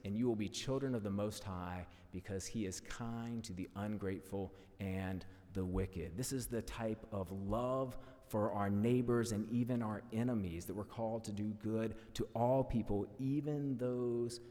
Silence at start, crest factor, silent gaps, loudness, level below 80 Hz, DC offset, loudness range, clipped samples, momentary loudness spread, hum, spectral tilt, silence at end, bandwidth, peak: 0.05 s; 16 dB; none; -40 LUFS; -56 dBFS; under 0.1%; 6 LU; under 0.1%; 9 LU; none; -6.5 dB/octave; 0 s; 18 kHz; -22 dBFS